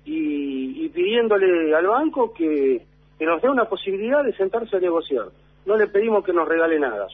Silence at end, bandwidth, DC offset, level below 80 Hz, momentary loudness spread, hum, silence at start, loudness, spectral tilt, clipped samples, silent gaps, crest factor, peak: 0 s; 3.9 kHz; under 0.1%; -58 dBFS; 9 LU; none; 0.05 s; -21 LUFS; -8 dB/octave; under 0.1%; none; 12 dB; -8 dBFS